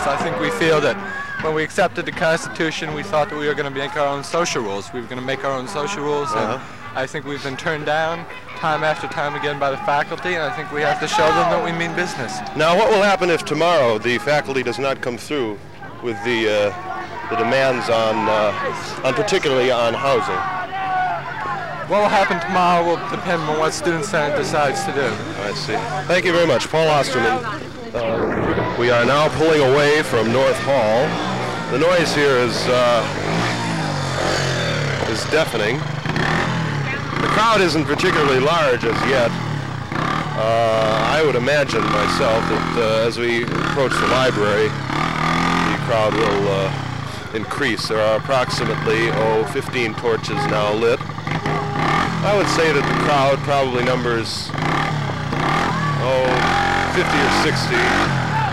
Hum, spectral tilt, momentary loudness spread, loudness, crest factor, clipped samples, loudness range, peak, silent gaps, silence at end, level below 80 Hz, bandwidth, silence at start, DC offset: none; -5 dB/octave; 8 LU; -19 LUFS; 12 dB; under 0.1%; 4 LU; -6 dBFS; none; 0 s; -44 dBFS; 16 kHz; 0 s; 1%